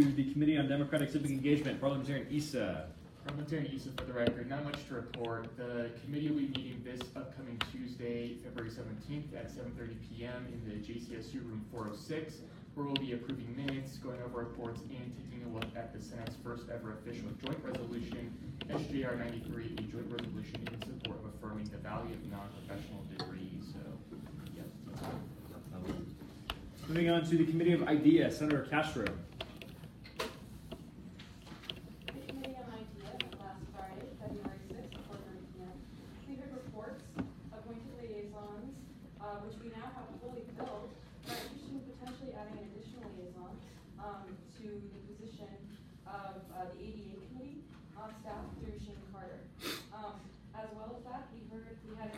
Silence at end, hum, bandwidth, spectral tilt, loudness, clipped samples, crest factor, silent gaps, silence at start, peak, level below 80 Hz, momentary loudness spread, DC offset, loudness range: 0 s; none; 16 kHz; -6.5 dB/octave; -40 LUFS; under 0.1%; 26 dB; none; 0 s; -14 dBFS; -60 dBFS; 17 LU; under 0.1%; 15 LU